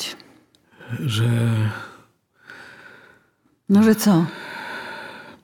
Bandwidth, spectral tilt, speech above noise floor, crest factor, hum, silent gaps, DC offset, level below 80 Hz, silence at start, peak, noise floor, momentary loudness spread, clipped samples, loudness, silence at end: 19.5 kHz; -6 dB/octave; 45 dB; 18 dB; none; none; under 0.1%; -66 dBFS; 0 s; -4 dBFS; -63 dBFS; 25 LU; under 0.1%; -20 LUFS; 0.1 s